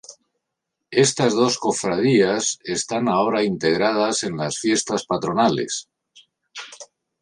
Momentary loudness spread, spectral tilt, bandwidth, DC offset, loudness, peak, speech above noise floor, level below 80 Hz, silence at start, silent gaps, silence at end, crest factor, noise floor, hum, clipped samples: 11 LU; -4 dB/octave; 11.5 kHz; under 0.1%; -20 LUFS; -4 dBFS; 60 dB; -60 dBFS; 0.1 s; none; 0.35 s; 18 dB; -80 dBFS; none; under 0.1%